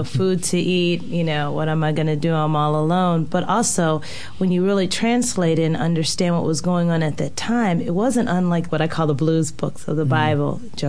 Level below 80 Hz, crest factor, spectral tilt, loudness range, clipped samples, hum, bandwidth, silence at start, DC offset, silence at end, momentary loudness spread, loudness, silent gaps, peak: -50 dBFS; 14 dB; -5.5 dB/octave; 1 LU; under 0.1%; none; 11 kHz; 0 s; 3%; 0 s; 4 LU; -20 LUFS; none; -6 dBFS